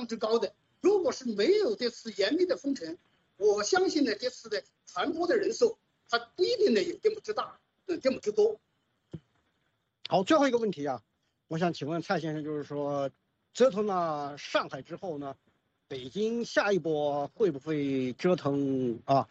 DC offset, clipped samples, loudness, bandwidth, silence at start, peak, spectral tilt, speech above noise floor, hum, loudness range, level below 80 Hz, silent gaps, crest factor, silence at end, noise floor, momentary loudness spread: under 0.1%; under 0.1%; -30 LUFS; 8 kHz; 0 s; -12 dBFS; -5 dB/octave; 48 dB; none; 3 LU; -74 dBFS; none; 18 dB; 0.05 s; -77 dBFS; 14 LU